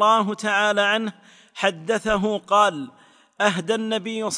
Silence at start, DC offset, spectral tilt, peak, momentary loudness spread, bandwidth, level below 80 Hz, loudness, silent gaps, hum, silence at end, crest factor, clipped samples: 0 s; under 0.1%; -3.5 dB/octave; -4 dBFS; 10 LU; 10.5 kHz; -54 dBFS; -21 LUFS; none; none; 0 s; 18 dB; under 0.1%